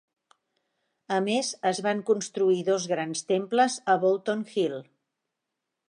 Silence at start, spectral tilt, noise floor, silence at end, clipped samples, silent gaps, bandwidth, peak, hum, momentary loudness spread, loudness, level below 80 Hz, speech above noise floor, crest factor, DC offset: 1.1 s; -4 dB/octave; -84 dBFS; 1.05 s; under 0.1%; none; 11.5 kHz; -10 dBFS; none; 6 LU; -26 LUFS; -82 dBFS; 58 dB; 18 dB; under 0.1%